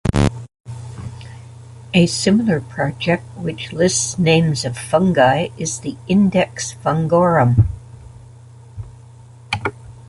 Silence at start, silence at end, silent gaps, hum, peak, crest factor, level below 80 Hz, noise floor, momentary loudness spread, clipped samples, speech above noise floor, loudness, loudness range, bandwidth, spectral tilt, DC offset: 0.05 s; 0.05 s; 0.60-0.64 s; none; -2 dBFS; 18 dB; -38 dBFS; -41 dBFS; 21 LU; under 0.1%; 25 dB; -17 LUFS; 3 LU; 11.5 kHz; -5.5 dB/octave; under 0.1%